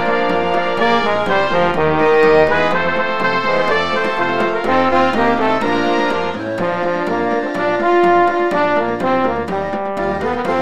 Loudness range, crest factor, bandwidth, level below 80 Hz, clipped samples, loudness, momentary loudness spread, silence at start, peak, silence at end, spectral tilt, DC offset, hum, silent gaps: 2 LU; 14 dB; 11 kHz; -42 dBFS; under 0.1%; -16 LUFS; 7 LU; 0 s; -2 dBFS; 0 s; -6 dB/octave; 4%; none; none